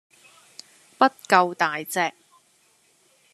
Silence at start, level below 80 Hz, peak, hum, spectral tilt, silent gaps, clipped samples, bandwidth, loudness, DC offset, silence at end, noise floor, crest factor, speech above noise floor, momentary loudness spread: 1 s; -78 dBFS; -2 dBFS; none; -3.5 dB/octave; none; under 0.1%; 13.5 kHz; -22 LUFS; under 0.1%; 1.25 s; -62 dBFS; 24 dB; 40 dB; 9 LU